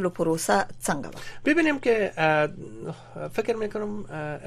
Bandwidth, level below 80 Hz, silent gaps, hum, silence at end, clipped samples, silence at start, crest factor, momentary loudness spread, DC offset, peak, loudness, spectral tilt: 15 kHz; -52 dBFS; none; none; 0 s; under 0.1%; 0 s; 18 dB; 15 LU; under 0.1%; -8 dBFS; -25 LUFS; -5 dB/octave